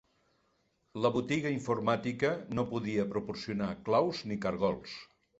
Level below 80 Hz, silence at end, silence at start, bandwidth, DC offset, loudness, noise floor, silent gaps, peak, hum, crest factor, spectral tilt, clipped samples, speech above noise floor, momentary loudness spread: -64 dBFS; 0.35 s; 0.95 s; 8.2 kHz; under 0.1%; -33 LUFS; -74 dBFS; none; -14 dBFS; none; 18 dB; -6.5 dB/octave; under 0.1%; 42 dB; 8 LU